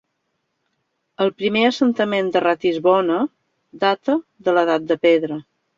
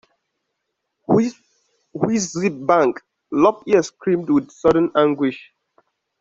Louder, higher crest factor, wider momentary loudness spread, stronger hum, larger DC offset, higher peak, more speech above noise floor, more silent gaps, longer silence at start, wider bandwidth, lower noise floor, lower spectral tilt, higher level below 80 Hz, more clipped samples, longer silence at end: about the same, -19 LUFS vs -19 LUFS; about the same, 16 dB vs 18 dB; second, 6 LU vs 10 LU; neither; neither; about the same, -4 dBFS vs -2 dBFS; second, 55 dB vs 59 dB; neither; about the same, 1.2 s vs 1.1 s; about the same, 7.6 kHz vs 7.8 kHz; second, -73 dBFS vs -77 dBFS; about the same, -6 dB/octave vs -6 dB/octave; second, -66 dBFS vs -58 dBFS; neither; second, 0.35 s vs 0.8 s